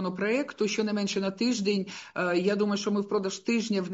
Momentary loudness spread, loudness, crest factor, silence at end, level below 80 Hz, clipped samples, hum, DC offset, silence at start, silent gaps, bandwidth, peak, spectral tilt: 4 LU; -28 LUFS; 14 dB; 0 s; -74 dBFS; under 0.1%; none; under 0.1%; 0 s; none; 8 kHz; -14 dBFS; -4.5 dB/octave